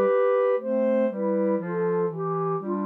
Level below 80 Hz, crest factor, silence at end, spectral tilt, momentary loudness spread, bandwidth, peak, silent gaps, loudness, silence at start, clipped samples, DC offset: -82 dBFS; 10 dB; 0 s; -10.5 dB/octave; 6 LU; 3.7 kHz; -14 dBFS; none; -25 LUFS; 0 s; under 0.1%; under 0.1%